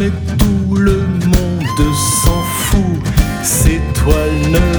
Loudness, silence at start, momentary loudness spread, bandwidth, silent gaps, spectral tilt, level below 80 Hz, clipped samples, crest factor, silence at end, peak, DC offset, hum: -14 LUFS; 0 s; 3 LU; over 20 kHz; none; -5 dB/octave; -18 dBFS; under 0.1%; 12 dB; 0 s; 0 dBFS; under 0.1%; none